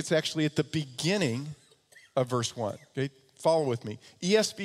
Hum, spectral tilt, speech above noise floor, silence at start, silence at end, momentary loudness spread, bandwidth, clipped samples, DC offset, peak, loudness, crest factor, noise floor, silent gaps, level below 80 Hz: none; -4.5 dB/octave; 30 dB; 0 s; 0 s; 10 LU; 15 kHz; under 0.1%; under 0.1%; -12 dBFS; -30 LUFS; 18 dB; -59 dBFS; none; -70 dBFS